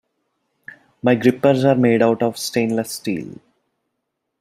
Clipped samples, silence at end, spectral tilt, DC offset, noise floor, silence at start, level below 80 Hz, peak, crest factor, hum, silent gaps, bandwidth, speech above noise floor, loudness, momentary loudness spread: under 0.1%; 1.05 s; -6 dB/octave; under 0.1%; -76 dBFS; 1.05 s; -62 dBFS; -2 dBFS; 18 dB; none; none; 15.5 kHz; 59 dB; -18 LUFS; 10 LU